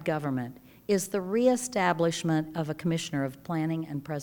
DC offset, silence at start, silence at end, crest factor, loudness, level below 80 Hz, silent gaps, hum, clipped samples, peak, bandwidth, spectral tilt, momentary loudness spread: under 0.1%; 0 s; 0 s; 18 dB; -29 LUFS; -66 dBFS; none; none; under 0.1%; -10 dBFS; 20 kHz; -5.5 dB/octave; 9 LU